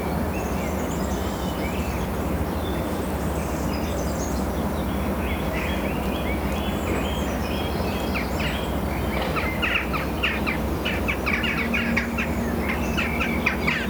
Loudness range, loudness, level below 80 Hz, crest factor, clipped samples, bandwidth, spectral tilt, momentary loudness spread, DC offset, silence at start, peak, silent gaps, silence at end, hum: 3 LU; -25 LUFS; -32 dBFS; 18 dB; under 0.1%; over 20 kHz; -5.5 dB/octave; 4 LU; under 0.1%; 0 s; -6 dBFS; none; 0 s; none